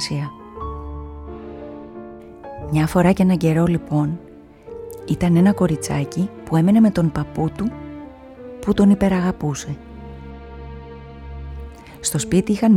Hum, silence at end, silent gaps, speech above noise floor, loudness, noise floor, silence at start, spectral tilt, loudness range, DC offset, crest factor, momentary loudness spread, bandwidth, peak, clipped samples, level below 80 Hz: none; 0 s; none; 22 dB; -19 LUFS; -39 dBFS; 0 s; -6.5 dB/octave; 6 LU; under 0.1%; 18 dB; 22 LU; 15 kHz; -4 dBFS; under 0.1%; -40 dBFS